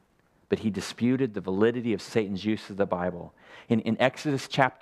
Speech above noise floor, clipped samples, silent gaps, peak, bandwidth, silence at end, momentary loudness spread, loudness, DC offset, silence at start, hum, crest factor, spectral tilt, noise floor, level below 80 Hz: 38 dB; under 0.1%; none; -4 dBFS; 13.5 kHz; 0.05 s; 6 LU; -28 LUFS; under 0.1%; 0.5 s; none; 22 dB; -6 dB/octave; -65 dBFS; -64 dBFS